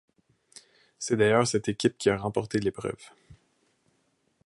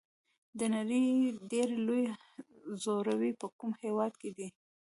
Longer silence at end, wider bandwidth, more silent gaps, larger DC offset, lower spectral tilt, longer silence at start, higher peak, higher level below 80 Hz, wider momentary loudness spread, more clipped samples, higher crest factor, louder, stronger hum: first, 1.1 s vs 0.35 s; about the same, 11.5 kHz vs 11.5 kHz; second, none vs 3.52-3.59 s; neither; about the same, -5 dB/octave vs -5.5 dB/octave; first, 1 s vs 0.55 s; first, -8 dBFS vs -20 dBFS; first, -60 dBFS vs -82 dBFS; second, 14 LU vs 17 LU; neither; first, 22 dB vs 14 dB; first, -27 LUFS vs -34 LUFS; neither